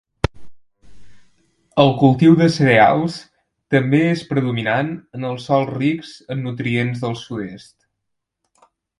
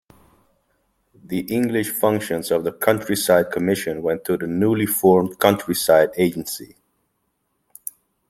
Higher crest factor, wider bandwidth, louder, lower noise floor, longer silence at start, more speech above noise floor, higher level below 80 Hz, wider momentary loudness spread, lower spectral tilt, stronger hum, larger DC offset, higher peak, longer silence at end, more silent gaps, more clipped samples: about the same, 18 dB vs 20 dB; second, 11.5 kHz vs 16.5 kHz; about the same, -18 LUFS vs -20 LUFS; first, -77 dBFS vs -71 dBFS; second, 0.35 s vs 1.3 s; first, 61 dB vs 52 dB; first, -44 dBFS vs -58 dBFS; about the same, 15 LU vs 13 LU; first, -7 dB/octave vs -5 dB/octave; neither; neither; about the same, 0 dBFS vs -2 dBFS; second, 1.4 s vs 1.65 s; neither; neither